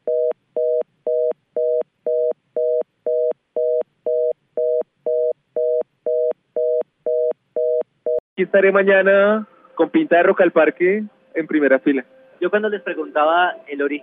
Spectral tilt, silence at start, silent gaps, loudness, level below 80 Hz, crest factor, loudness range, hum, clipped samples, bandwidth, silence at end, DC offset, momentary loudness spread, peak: -9 dB/octave; 0.05 s; 8.20-8.36 s; -19 LUFS; -80 dBFS; 18 dB; 6 LU; none; under 0.1%; 3.9 kHz; 0.05 s; under 0.1%; 9 LU; -2 dBFS